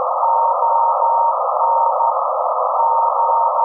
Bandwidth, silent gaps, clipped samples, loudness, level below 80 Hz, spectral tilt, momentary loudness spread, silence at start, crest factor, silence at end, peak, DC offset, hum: 1.5 kHz; none; under 0.1%; -16 LUFS; under -90 dBFS; -5 dB/octave; 3 LU; 0 s; 12 dB; 0 s; -4 dBFS; under 0.1%; none